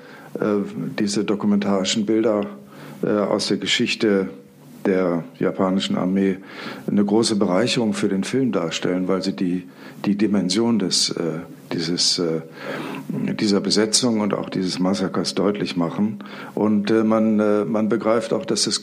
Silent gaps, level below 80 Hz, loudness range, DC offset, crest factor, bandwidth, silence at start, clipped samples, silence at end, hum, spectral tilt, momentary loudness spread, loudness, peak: none; -68 dBFS; 1 LU; under 0.1%; 18 dB; 14.5 kHz; 0 s; under 0.1%; 0 s; none; -4.5 dB/octave; 10 LU; -21 LUFS; -4 dBFS